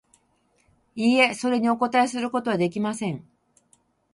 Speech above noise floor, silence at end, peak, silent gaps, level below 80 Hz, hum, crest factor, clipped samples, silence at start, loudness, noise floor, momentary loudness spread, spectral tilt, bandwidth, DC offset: 44 dB; 0.9 s; -4 dBFS; none; -68 dBFS; none; 22 dB; under 0.1%; 0.95 s; -23 LUFS; -66 dBFS; 12 LU; -5 dB/octave; 11.5 kHz; under 0.1%